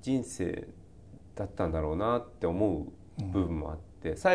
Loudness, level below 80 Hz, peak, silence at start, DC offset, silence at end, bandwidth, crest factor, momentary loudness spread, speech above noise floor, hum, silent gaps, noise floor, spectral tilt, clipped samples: -33 LUFS; -46 dBFS; -14 dBFS; 0 s; 0.1%; 0 s; 11 kHz; 18 dB; 11 LU; 22 dB; none; none; -52 dBFS; -6.5 dB/octave; under 0.1%